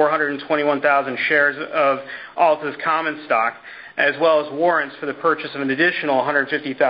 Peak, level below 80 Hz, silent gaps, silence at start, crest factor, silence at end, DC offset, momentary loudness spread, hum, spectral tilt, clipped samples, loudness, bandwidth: -4 dBFS; -66 dBFS; none; 0 s; 16 dB; 0 s; under 0.1%; 6 LU; none; -9 dB/octave; under 0.1%; -19 LUFS; 5.4 kHz